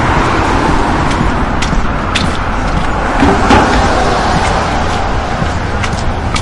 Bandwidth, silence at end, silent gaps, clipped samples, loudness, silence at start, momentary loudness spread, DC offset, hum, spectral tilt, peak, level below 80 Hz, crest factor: 11.5 kHz; 0 s; none; under 0.1%; -12 LUFS; 0 s; 7 LU; under 0.1%; none; -5.5 dB/octave; 0 dBFS; -18 dBFS; 12 dB